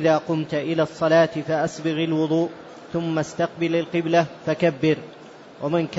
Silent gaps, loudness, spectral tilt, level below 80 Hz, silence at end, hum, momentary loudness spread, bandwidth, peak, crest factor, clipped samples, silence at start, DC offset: none; -23 LUFS; -6.5 dB/octave; -62 dBFS; 0 s; none; 9 LU; 8 kHz; -6 dBFS; 16 dB; under 0.1%; 0 s; under 0.1%